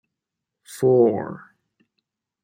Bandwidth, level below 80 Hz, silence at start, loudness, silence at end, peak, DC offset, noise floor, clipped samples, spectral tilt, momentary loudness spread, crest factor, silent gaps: 16 kHz; -70 dBFS; 0.7 s; -20 LUFS; 1.05 s; -6 dBFS; under 0.1%; -84 dBFS; under 0.1%; -8 dB/octave; 24 LU; 18 dB; none